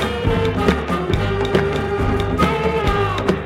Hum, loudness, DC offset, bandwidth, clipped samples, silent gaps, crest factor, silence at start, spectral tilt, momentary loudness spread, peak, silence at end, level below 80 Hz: none; -19 LUFS; under 0.1%; 15.5 kHz; under 0.1%; none; 18 dB; 0 s; -6.5 dB/octave; 3 LU; 0 dBFS; 0 s; -28 dBFS